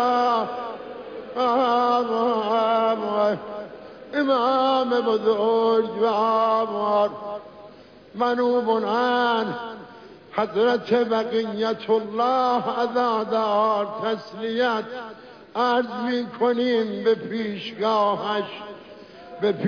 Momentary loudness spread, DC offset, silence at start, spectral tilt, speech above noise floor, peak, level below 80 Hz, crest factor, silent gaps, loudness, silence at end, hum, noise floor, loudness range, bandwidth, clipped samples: 15 LU; under 0.1%; 0 s; -6 dB/octave; 24 dB; -8 dBFS; -68 dBFS; 14 dB; none; -22 LUFS; 0 s; none; -46 dBFS; 3 LU; 5.4 kHz; under 0.1%